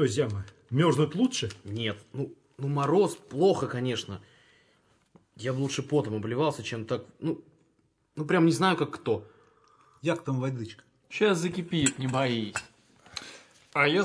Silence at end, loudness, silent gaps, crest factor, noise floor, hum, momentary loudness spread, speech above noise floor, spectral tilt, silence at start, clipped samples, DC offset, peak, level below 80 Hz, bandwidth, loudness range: 0 s; -29 LUFS; none; 20 dB; -70 dBFS; none; 14 LU; 43 dB; -5 dB/octave; 0 s; under 0.1%; under 0.1%; -10 dBFS; -68 dBFS; 11 kHz; 4 LU